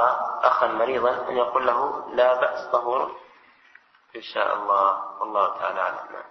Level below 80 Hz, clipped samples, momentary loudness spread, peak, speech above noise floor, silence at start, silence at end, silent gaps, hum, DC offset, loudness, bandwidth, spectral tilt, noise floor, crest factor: -66 dBFS; under 0.1%; 10 LU; -4 dBFS; 32 dB; 0 s; 0.05 s; none; none; under 0.1%; -23 LUFS; 6.2 kHz; -4.5 dB/octave; -55 dBFS; 20 dB